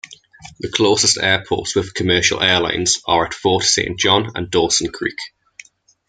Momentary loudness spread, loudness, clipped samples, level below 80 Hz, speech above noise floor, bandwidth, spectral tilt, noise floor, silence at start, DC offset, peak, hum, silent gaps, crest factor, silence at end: 10 LU; -16 LUFS; under 0.1%; -48 dBFS; 27 dB; 10 kHz; -2.5 dB/octave; -45 dBFS; 0.1 s; under 0.1%; 0 dBFS; none; none; 18 dB; 0.8 s